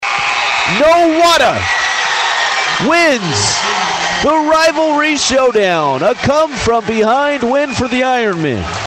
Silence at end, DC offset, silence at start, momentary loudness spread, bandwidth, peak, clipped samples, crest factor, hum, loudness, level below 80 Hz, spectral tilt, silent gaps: 0 s; under 0.1%; 0 s; 5 LU; 15.5 kHz; -2 dBFS; under 0.1%; 12 dB; none; -12 LUFS; -40 dBFS; -3 dB/octave; none